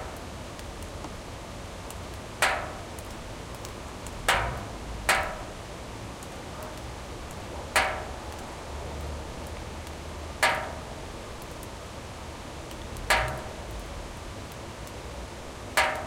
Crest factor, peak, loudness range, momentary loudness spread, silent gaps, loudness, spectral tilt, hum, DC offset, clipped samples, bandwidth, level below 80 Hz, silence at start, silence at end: 26 dB; -8 dBFS; 3 LU; 14 LU; none; -33 LUFS; -3 dB/octave; none; under 0.1%; under 0.1%; 16.5 kHz; -44 dBFS; 0 s; 0 s